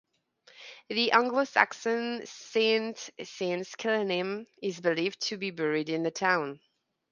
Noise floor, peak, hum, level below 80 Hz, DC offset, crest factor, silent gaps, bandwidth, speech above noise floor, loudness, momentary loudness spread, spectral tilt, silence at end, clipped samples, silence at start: -63 dBFS; -4 dBFS; none; -82 dBFS; under 0.1%; 26 dB; none; 7.4 kHz; 33 dB; -29 LUFS; 14 LU; -3.5 dB/octave; 0.55 s; under 0.1%; 0.6 s